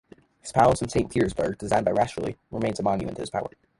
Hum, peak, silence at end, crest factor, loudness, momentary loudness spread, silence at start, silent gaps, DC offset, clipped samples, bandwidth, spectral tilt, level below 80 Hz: none; -6 dBFS; 0.3 s; 20 dB; -25 LUFS; 11 LU; 0.45 s; none; under 0.1%; under 0.1%; 11.5 kHz; -6 dB/octave; -48 dBFS